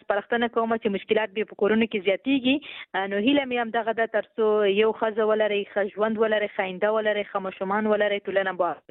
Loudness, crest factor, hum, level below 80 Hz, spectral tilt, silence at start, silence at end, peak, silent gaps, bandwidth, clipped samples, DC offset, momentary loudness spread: -24 LUFS; 14 dB; none; -68 dBFS; -9.5 dB/octave; 0.1 s; 0.1 s; -10 dBFS; none; 4.1 kHz; under 0.1%; under 0.1%; 5 LU